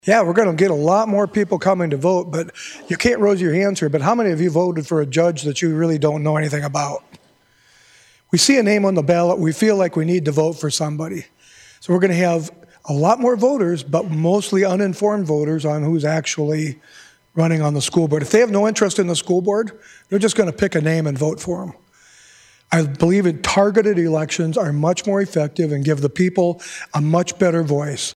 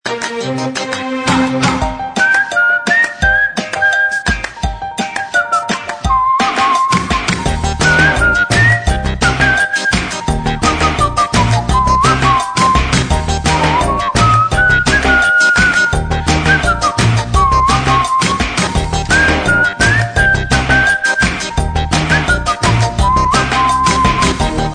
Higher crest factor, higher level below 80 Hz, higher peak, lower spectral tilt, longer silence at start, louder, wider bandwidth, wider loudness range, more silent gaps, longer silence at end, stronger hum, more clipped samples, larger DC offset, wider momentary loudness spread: about the same, 16 dB vs 12 dB; second, -54 dBFS vs -22 dBFS; about the same, -2 dBFS vs 0 dBFS; first, -5.5 dB/octave vs -4 dB/octave; about the same, 0.05 s vs 0.05 s; second, -18 LUFS vs -12 LUFS; first, 14 kHz vs 10 kHz; about the same, 3 LU vs 3 LU; neither; about the same, 0.05 s vs 0 s; neither; neither; neither; about the same, 8 LU vs 7 LU